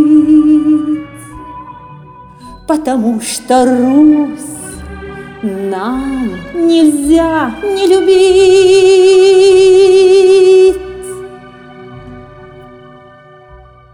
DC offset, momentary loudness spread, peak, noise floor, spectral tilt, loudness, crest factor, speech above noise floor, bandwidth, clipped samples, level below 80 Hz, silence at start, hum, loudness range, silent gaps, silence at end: under 0.1%; 21 LU; 0 dBFS; -38 dBFS; -4.5 dB/octave; -9 LUFS; 10 dB; 30 dB; 13.5 kHz; under 0.1%; -38 dBFS; 0 s; none; 8 LU; none; 1.5 s